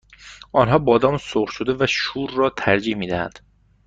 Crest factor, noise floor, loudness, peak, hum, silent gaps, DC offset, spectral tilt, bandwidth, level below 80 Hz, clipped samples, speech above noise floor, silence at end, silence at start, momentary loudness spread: 18 dB; -44 dBFS; -20 LUFS; -2 dBFS; none; none; under 0.1%; -5.5 dB/octave; 8 kHz; -48 dBFS; under 0.1%; 24 dB; 0.5 s; 0.2 s; 9 LU